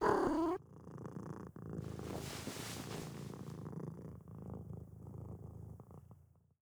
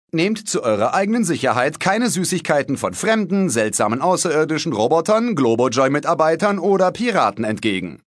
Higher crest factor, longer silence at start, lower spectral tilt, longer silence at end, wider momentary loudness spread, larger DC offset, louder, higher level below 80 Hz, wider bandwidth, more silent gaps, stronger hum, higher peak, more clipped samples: first, 26 dB vs 16 dB; second, 0 s vs 0.15 s; first, -6 dB/octave vs -4.5 dB/octave; first, 0.4 s vs 0.1 s; first, 16 LU vs 3 LU; neither; second, -44 LUFS vs -18 LUFS; about the same, -62 dBFS vs -62 dBFS; first, over 20 kHz vs 11 kHz; neither; neither; second, -18 dBFS vs -2 dBFS; neither